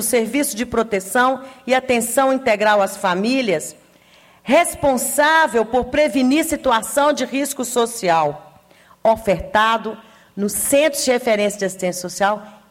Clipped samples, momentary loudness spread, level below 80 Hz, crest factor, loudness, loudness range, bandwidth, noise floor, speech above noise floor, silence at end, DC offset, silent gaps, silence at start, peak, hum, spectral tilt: under 0.1%; 8 LU; -48 dBFS; 14 dB; -18 LUFS; 2 LU; 16.5 kHz; -50 dBFS; 32 dB; 0.2 s; under 0.1%; none; 0 s; -4 dBFS; none; -3 dB/octave